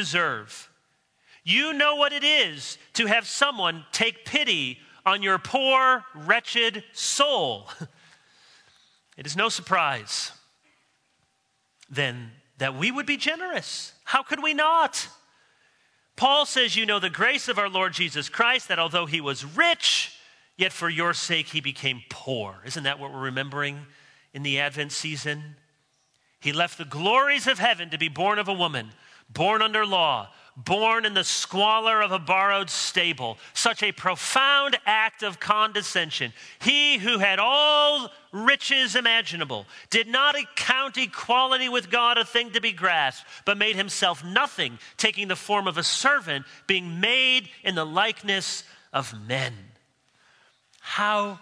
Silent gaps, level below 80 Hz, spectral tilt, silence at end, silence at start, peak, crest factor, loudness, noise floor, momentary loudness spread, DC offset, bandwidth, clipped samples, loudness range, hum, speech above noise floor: none; -74 dBFS; -2 dB/octave; 0.05 s; 0 s; -2 dBFS; 24 dB; -23 LUFS; -71 dBFS; 11 LU; under 0.1%; 11 kHz; under 0.1%; 8 LU; none; 47 dB